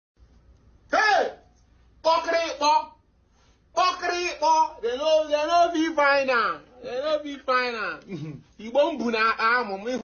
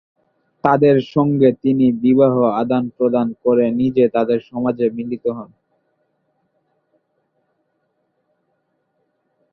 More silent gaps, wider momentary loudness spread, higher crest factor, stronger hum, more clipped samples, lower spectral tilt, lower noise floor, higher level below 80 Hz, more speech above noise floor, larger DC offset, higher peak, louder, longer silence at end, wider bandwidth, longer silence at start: neither; about the same, 11 LU vs 9 LU; about the same, 14 dB vs 18 dB; neither; neither; second, -3 dB/octave vs -10 dB/octave; second, -61 dBFS vs -69 dBFS; about the same, -60 dBFS vs -58 dBFS; second, 36 dB vs 53 dB; neither; second, -10 dBFS vs 0 dBFS; second, -23 LUFS vs -17 LUFS; second, 0 s vs 4.1 s; first, 7 kHz vs 5.4 kHz; first, 0.9 s vs 0.65 s